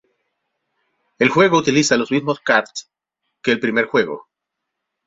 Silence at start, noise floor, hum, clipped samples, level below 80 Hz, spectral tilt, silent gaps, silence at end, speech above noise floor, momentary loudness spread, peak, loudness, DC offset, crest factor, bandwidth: 1.2 s; -80 dBFS; none; under 0.1%; -60 dBFS; -4 dB/octave; none; 0.85 s; 63 dB; 12 LU; -2 dBFS; -17 LUFS; under 0.1%; 18 dB; 8 kHz